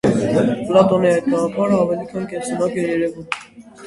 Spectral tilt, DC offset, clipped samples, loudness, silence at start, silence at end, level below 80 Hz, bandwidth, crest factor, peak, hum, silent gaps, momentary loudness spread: -6.5 dB/octave; under 0.1%; under 0.1%; -18 LUFS; 0.05 s; 0 s; -52 dBFS; 11.5 kHz; 18 dB; 0 dBFS; none; none; 12 LU